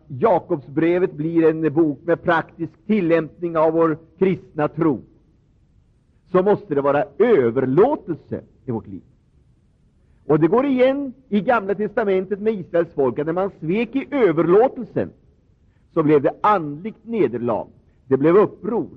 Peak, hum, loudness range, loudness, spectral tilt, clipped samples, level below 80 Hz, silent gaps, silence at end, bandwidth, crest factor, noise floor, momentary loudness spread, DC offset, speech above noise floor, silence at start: -6 dBFS; none; 3 LU; -20 LUFS; -10 dB/octave; under 0.1%; -56 dBFS; none; 0 s; 5.2 kHz; 14 dB; -57 dBFS; 13 LU; under 0.1%; 38 dB; 0.1 s